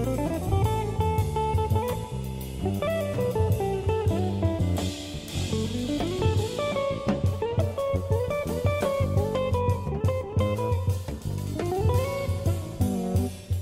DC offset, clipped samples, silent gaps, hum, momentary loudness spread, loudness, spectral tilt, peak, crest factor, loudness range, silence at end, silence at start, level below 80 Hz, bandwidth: under 0.1%; under 0.1%; none; none; 5 LU; -27 LUFS; -7 dB/octave; -12 dBFS; 14 dB; 1 LU; 0 s; 0 s; -38 dBFS; 16 kHz